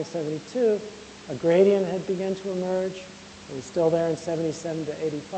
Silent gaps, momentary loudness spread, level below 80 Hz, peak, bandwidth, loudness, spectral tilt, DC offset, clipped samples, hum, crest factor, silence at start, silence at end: none; 18 LU; -62 dBFS; -8 dBFS; 8.8 kHz; -25 LUFS; -6 dB/octave; under 0.1%; under 0.1%; none; 18 dB; 0 s; 0 s